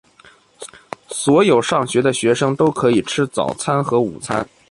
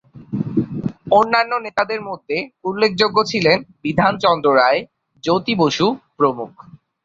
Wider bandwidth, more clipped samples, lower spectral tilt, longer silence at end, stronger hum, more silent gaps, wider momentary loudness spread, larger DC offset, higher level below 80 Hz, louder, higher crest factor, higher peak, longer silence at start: first, 11.5 kHz vs 7.6 kHz; neither; about the same, -5 dB/octave vs -5.5 dB/octave; second, 0.25 s vs 0.55 s; neither; neither; first, 19 LU vs 12 LU; neither; about the same, -54 dBFS vs -54 dBFS; about the same, -17 LUFS vs -18 LUFS; about the same, 16 dB vs 18 dB; about the same, -2 dBFS vs 0 dBFS; first, 0.6 s vs 0.15 s